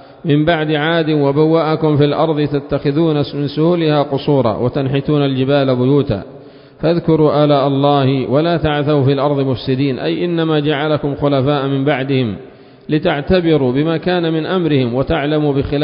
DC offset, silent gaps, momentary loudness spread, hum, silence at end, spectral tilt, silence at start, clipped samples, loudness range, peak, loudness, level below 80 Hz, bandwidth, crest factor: under 0.1%; none; 5 LU; none; 0 s; -12.5 dB/octave; 0.25 s; under 0.1%; 2 LU; 0 dBFS; -15 LUFS; -40 dBFS; 5.4 kHz; 14 dB